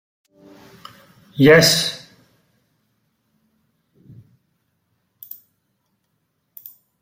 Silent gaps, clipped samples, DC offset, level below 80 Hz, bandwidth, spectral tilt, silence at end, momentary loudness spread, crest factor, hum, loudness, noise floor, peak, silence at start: none; under 0.1%; under 0.1%; -58 dBFS; 16.5 kHz; -4 dB/octave; 5.05 s; 29 LU; 22 dB; none; -13 LUFS; -71 dBFS; 0 dBFS; 1.4 s